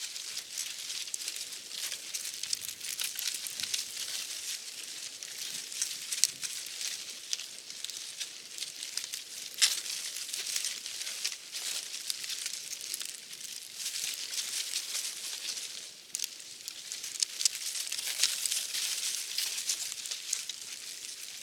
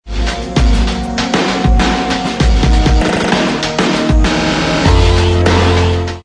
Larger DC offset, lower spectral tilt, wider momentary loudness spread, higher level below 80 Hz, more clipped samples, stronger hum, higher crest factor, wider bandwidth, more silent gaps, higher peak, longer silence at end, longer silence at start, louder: neither; second, 3.5 dB/octave vs -5.5 dB/octave; first, 11 LU vs 5 LU; second, -88 dBFS vs -16 dBFS; neither; neither; first, 36 dB vs 12 dB; first, 19 kHz vs 10.5 kHz; neither; about the same, -2 dBFS vs 0 dBFS; about the same, 0 s vs 0.05 s; about the same, 0 s vs 0.05 s; second, -34 LUFS vs -13 LUFS